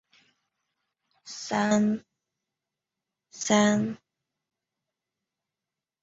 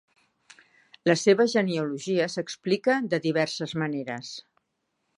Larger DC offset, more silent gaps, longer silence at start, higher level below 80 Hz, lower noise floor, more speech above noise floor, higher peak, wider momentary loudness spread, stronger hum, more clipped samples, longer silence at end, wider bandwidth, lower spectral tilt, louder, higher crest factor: neither; neither; first, 1.25 s vs 1.05 s; first, -70 dBFS vs -76 dBFS; first, -89 dBFS vs -78 dBFS; first, 65 dB vs 52 dB; about the same, -8 dBFS vs -6 dBFS; first, 18 LU vs 13 LU; neither; neither; first, 2.05 s vs 0.75 s; second, 8 kHz vs 11 kHz; about the same, -4.5 dB/octave vs -5 dB/octave; about the same, -26 LUFS vs -26 LUFS; about the same, 22 dB vs 20 dB